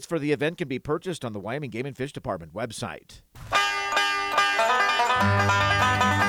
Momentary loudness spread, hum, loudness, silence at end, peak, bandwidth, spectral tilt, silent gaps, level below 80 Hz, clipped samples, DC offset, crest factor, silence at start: 12 LU; none; -24 LUFS; 0 s; -8 dBFS; 16.5 kHz; -4 dB/octave; none; -52 dBFS; under 0.1%; under 0.1%; 16 dB; 0 s